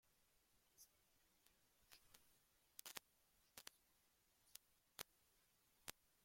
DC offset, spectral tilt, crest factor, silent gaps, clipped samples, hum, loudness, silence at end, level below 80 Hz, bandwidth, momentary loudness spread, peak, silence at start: under 0.1%; 0 dB/octave; 44 dB; none; under 0.1%; none; -61 LUFS; 0 s; -88 dBFS; 16.5 kHz; 9 LU; -24 dBFS; 0.05 s